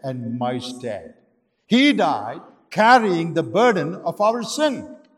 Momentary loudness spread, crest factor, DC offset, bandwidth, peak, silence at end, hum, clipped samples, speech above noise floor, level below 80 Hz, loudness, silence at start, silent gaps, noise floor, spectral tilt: 17 LU; 18 dB; under 0.1%; 13.5 kHz; -2 dBFS; 0.2 s; none; under 0.1%; 44 dB; -70 dBFS; -19 LUFS; 0.05 s; none; -63 dBFS; -5 dB/octave